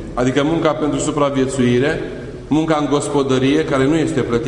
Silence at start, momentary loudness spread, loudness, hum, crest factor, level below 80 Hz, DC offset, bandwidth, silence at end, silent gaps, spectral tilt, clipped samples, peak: 0 s; 4 LU; -17 LUFS; none; 16 dB; -38 dBFS; under 0.1%; 11 kHz; 0 s; none; -6 dB/octave; under 0.1%; 0 dBFS